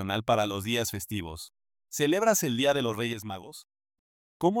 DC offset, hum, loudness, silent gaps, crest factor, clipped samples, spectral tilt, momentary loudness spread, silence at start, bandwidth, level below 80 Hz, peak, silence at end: under 0.1%; none; -28 LUFS; 3.99-4.40 s; 20 dB; under 0.1%; -4 dB/octave; 17 LU; 0 s; 19 kHz; -62 dBFS; -10 dBFS; 0 s